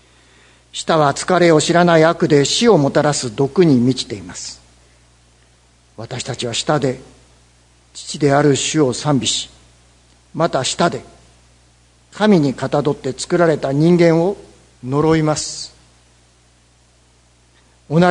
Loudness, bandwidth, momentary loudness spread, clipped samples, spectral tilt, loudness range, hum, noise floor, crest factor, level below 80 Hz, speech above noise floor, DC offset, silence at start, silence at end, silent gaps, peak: -16 LUFS; 11 kHz; 18 LU; under 0.1%; -5 dB/octave; 9 LU; 60 Hz at -45 dBFS; -53 dBFS; 18 dB; -50 dBFS; 38 dB; under 0.1%; 0.75 s; 0 s; none; 0 dBFS